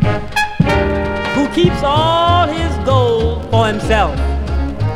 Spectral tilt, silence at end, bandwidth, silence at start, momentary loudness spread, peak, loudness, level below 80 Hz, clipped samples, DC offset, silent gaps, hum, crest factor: -6.5 dB/octave; 0 s; 14 kHz; 0 s; 6 LU; 0 dBFS; -15 LUFS; -24 dBFS; under 0.1%; under 0.1%; none; none; 14 dB